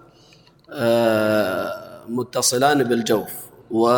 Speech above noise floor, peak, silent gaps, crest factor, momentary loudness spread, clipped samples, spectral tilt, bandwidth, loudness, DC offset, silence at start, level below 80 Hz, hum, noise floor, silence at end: 33 dB; -4 dBFS; none; 18 dB; 15 LU; under 0.1%; -4 dB/octave; 19 kHz; -20 LUFS; under 0.1%; 0.7 s; -62 dBFS; none; -52 dBFS; 0 s